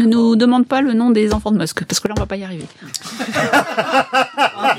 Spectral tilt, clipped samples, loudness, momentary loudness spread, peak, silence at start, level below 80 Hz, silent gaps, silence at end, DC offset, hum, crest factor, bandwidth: -4.5 dB/octave; under 0.1%; -16 LUFS; 14 LU; 0 dBFS; 0 s; -38 dBFS; none; 0 s; under 0.1%; none; 16 dB; 15.5 kHz